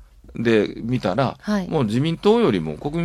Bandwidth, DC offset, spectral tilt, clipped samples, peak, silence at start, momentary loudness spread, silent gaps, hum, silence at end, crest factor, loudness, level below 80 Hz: 12 kHz; under 0.1%; -7 dB/octave; under 0.1%; -4 dBFS; 0 s; 7 LU; none; none; 0 s; 16 dB; -21 LUFS; -46 dBFS